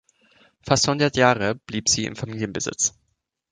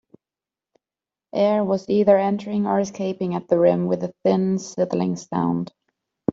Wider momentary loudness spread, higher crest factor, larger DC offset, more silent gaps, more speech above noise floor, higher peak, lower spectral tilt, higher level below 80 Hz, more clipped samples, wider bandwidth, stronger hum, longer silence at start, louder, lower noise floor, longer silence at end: about the same, 11 LU vs 9 LU; about the same, 22 dB vs 18 dB; neither; neither; second, 51 dB vs over 69 dB; about the same, -2 dBFS vs -4 dBFS; second, -3 dB/octave vs -7.5 dB/octave; first, -52 dBFS vs -64 dBFS; neither; first, 10 kHz vs 7.6 kHz; neither; second, 0.65 s vs 1.35 s; about the same, -22 LUFS vs -22 LUFS; second, -73 dBFS vs under -90 dBFS; first, 0.65 s vs 0 s